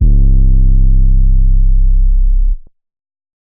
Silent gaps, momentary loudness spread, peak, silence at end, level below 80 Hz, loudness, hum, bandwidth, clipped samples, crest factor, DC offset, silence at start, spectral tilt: none; 5 LU; -2 dBFS; 0.9 s; -8 dBFS; -14 LUFS; none; 0.5 kHz; under 0.1%; 6 dB; under 0.1%; 0 s; -19 dB/octave